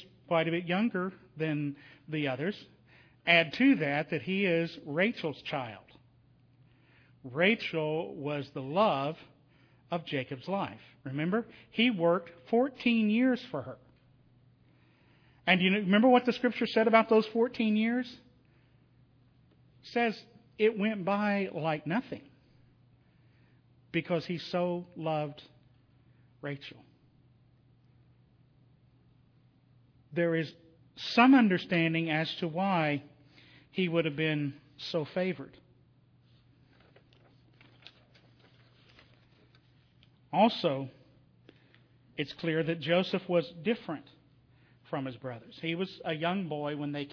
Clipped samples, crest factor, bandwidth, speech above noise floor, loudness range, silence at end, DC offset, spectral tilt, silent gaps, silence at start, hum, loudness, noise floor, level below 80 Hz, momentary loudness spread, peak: under 0.1%; 24 dB; 5.4 kHz; 34 dB; 11 LU; 0 s; under 0.1%; -7.5 dB/octave; none; 0 s; none; -30 LUFS; -64 dBFS; -74 dBFS; 16 LU; -8 dBFS